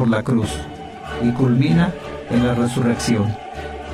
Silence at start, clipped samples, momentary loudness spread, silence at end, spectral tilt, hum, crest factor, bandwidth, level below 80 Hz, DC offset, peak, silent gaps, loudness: 0 s; under 0.1%; 14 LU; 0 s; -6.5 dB/octave; none; 14 dB; 13 kHz; -38 dBFS; under 0.1%; -4 dBFS; none; -19 LUFS